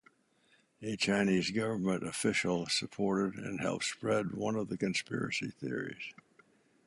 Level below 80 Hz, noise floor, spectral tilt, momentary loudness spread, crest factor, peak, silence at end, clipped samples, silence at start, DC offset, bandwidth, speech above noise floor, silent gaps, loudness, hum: -68 dBFS; -70 dBFS; -4.5 dB/octave; 9 LU; 18 dB; -16 dBFS; 0.75 s; under 0.1%; 0.8 s; under 0.1%; 11.5 kHz; 36 dB; none; -34 LUFS; none